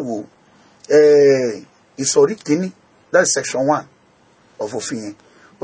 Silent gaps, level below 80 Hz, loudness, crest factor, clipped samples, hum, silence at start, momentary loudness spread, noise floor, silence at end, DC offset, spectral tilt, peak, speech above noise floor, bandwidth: none; -64 dBFS; -16 LUFS; 18 dB; under 0.1%; none; 0 s; 18 LU; -54 dBFS; 0.5 s; under 0.1%; -3.5 dB/octave; 0 dBFS; 38 dB; 8 kHz